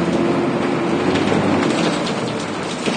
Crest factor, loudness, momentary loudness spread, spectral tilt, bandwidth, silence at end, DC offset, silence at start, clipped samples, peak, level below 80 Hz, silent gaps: 14 dB; -19 LUFS; 6 LU; -5.5 dB/octave; 10 kHz; 0 s; under 0.1%; 0 s; under 0.1%; -4 dBFS; -50 dBFS; none